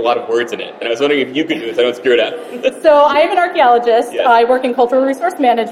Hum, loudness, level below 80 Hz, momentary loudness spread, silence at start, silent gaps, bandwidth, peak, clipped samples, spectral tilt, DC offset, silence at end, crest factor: none; -13 LUFS; -58 dBFS; 9 LU; 0 s; none; 13 kHz; 0 dBFS; under 0.1%; -4 dB/octave; under 0.1%; 0 s; 12 dB